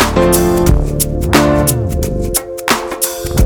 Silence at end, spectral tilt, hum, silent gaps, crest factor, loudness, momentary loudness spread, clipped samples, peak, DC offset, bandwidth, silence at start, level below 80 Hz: 0 s; -4.5 dB/octave; none; none; 12 dB; -13 LUFS; 6 LU; under 0.1%; 0 dBFS; under 0.1%; over 20 kHz; 0 s; -20 dBFS